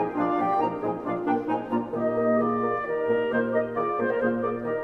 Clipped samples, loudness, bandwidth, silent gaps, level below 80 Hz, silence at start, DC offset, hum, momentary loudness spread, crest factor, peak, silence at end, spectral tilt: under 0.1%; -26 LUFS; 5.8 kHz; none; -60 dBFS; 0 s; under 0.1%; none; 4 LU; 14 dB; -12 dBFS; 0 s; -8.5 dB/octave